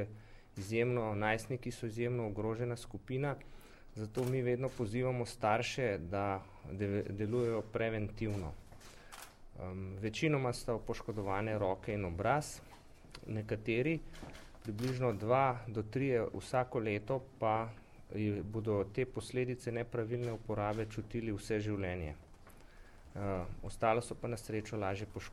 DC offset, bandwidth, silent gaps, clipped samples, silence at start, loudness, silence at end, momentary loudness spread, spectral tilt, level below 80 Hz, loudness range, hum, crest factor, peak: under 0.1%; 15 kHz; none; under 0.1%; 0 s; -37 LUFS; 0 s; 14 LU; -6.5 dB/octave; -56 dBFS; 4 LU; none; 20 dB; -18 dBFS